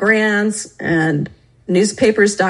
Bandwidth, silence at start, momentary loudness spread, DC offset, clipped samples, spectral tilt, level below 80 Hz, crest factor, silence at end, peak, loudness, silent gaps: 11.5 kHz; 0 s; 10 LU; under 0.1%; under 0.1%; -5 dB/octave; -52 dBFS; 14 dB; 0 s; -2 dBFS; -16 LUFS; none